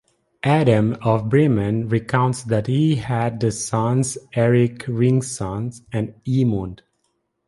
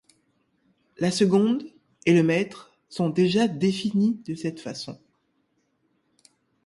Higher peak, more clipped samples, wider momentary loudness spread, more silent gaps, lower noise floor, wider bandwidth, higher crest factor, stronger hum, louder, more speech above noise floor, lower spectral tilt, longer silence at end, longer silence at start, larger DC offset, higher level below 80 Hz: first, -2 dBFS vs -6 dBFS; neither; second, 10 LU vs 15 LU; neither; about the same, -71 dBFS vs -71 dBFS; about the same, 11.5 kHz vs 11.5 kHz; about the same, 18 dB vs 18 dB; neither; first, -20 LUFS vs -24 LUFS; first, 52 dB vs 48 dB; about the same, -6.5 dB/octave vs -6 dB/octave; second, 0.7 s vs 1.7 s; second, 0.45 s vs 1 s; neither; first, -48 dBFS vs -66 dBFS